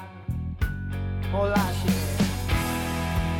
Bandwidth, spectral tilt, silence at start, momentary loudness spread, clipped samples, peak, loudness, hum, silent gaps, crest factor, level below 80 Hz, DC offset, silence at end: 17.5 kHz; -5.5 dB/octave; 0 s; 8 LU; under 0.1%; -10 dBFS; -27 LUFS; none; none; 16 dB; -34 dBFS; under 0.1%; 0 s